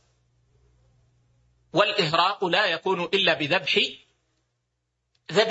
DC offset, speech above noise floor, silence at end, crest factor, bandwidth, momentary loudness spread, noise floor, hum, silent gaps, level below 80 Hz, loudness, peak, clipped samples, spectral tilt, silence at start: under 0.1%; 54 dB; 0 s; 22 dB; 8 kHz; 5 LU; -78 dBFS; 60 Hz at -55 dBFS; none; -68 dBFS; -23 LUFS; -6 dBFS; under 0.1%; -4 dB/octave; 1.75 s